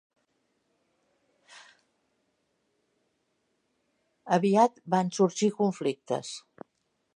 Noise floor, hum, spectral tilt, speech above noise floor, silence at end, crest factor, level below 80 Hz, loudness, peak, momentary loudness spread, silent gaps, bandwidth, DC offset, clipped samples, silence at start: -77 dBFS; none; -5.5 dB/octave; 50 dB; 0.75 s; 22 dB; -82 dBFS; -27 LUFS; -8 dBFS; 10 LU; none; 11 kHz; under 0.1%; under 0.1%; 4.25 s